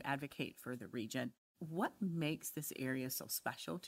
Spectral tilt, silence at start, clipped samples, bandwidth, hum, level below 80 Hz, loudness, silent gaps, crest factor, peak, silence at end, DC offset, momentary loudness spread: -4.5 dB/octave; 0 s; under 0.1%; 16 kHz; none; -80 dBFS; -42 LUFS; 1.38-1.55 s; 20 dB; -24 dBFS; 0 s; under 0.1%; 6 LU